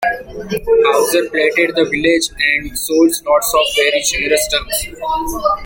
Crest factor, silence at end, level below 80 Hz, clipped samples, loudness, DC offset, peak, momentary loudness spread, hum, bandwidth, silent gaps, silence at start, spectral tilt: 14 dB; 0 s; -38 dBFS; under 0.1%; -14 LUFS; under 0.1%; 0 dBFS; 8 LU; none; 17 kHz; none; 0 s; -2 dB/octave